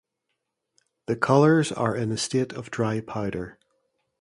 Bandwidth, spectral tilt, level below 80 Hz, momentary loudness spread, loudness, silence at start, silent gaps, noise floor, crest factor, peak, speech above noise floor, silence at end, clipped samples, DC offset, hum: 11.5 kHz; -6 dB/octave; -58 dBFS; 14 LU; -24 LUFS; 1.1 s; none; -80 dBFS; 20 dB; -6 dBFS; 56 dB; 0.7 s; under 0.1%; under 0.1%; none